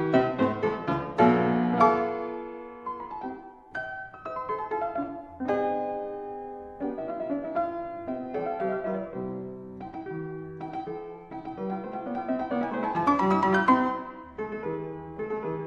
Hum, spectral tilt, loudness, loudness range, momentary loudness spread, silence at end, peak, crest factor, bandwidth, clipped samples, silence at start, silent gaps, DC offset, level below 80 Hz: none; -8 dB/octave; -29 LUFS; 8 LU; 16 LU; 0 s; -6 dBFS; 22 dB; 7.4 kHz; under 0.1%; 0 s; none; under 0.1%; -60 dBFS